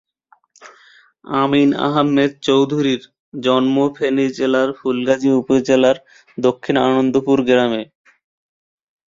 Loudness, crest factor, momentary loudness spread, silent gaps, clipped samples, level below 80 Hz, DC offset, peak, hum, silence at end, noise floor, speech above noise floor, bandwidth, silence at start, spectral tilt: -17 LUFS; 16 dB; 8 LU; 3.19-3.32 s; under 0.1%; -58 dBFS; under 0.1%; -2 dBFS; none; 1.25 s; -57 dBFS; 41 dB; 7.6 kHz; 0.65 s; -6 dB/octave